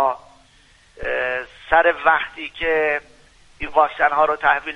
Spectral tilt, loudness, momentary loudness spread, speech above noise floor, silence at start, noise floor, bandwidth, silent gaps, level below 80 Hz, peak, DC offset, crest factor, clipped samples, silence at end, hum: -4.5 dB/octave; -19 LUFS; 12 LU; 34 dB; 0 s; -53 dBFS; 10 kHz; none; -46 dBFS; -2 dBFS; under 0.1%; 20 dB; under 0.1%; 0 s; none